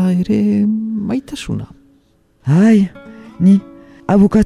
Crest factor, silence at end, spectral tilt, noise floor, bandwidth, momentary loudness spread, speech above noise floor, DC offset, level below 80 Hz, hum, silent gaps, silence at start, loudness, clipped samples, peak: 14 dB; 0 s; -8.5 dB/octave; -54 dBFS; 11 kHz; 14 LU; 42 dB; under 0.1%; -44 dBFS; none; none; 0 s; -15 LUFS; under 0.1%; -2 dBFS